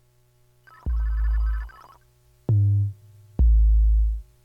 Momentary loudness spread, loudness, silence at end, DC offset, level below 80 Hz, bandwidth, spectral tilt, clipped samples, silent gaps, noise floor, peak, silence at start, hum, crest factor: 15 LU; -24 LUFS; 0.2 s; under 0.1%; -24 dBFS; 1.9 kHz; -10 dB/octave; under 0.1%; none; -60 dBFS; -12 dBFS; 0.85 s; none; 10 dB